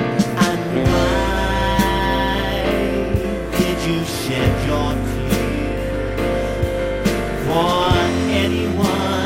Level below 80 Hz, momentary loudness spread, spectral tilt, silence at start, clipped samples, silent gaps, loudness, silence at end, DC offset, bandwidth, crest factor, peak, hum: -28 dBFS; 5 LU; -5.5 dB/octave; 0 s; under 0.1%; none; -19 LUFS; 0 s; under 0.1%; 16 kHz; 14 dB; -6 dBFS; none